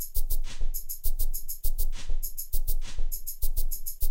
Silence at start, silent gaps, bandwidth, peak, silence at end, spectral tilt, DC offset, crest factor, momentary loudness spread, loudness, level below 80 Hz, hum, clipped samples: 0 s; none; 16.5 kHz; -12 dBFS; 0 s; -2.5 dB/octave; under 0.1%; 12 dB; 3 LU; -35 LUFS; -26 dBFS; none; under 0.1%